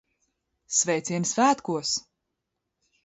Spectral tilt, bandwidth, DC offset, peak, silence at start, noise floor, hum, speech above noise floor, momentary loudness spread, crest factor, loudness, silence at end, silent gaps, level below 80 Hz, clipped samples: -3 dB/octave; 8.2 kHz; under 0.1%; -10 dBFS; 0.7 s; -82 dBFS; none; 57 dB; 6 LU; 20 dB; -25 LUFS; 1.05 s; none; -72 dBFS; under 0.1%